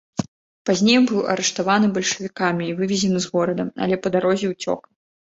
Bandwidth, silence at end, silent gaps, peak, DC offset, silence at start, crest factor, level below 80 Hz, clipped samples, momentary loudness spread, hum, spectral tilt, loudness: 8 kHz; 0.6 s; 0.28-0.65 s; -2 dBFS; under 0.1%; 0.2 s; 18 dB; -60 dBFS; under 0.1%; 11 LU; none; -4.5 dB/octave; -21 LUFS